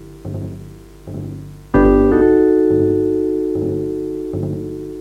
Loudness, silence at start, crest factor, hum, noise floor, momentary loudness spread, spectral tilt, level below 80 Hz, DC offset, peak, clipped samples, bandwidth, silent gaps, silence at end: -16 LUFS; 0 s; 16 dB; 50 Hz at -35 dBFS; -36 dBFS; 18 LU; -9.5 dB/octave; -30 dBFS; under 0.1%; -2 dBFS; under 0.1%; 9 kHz; none; 0 s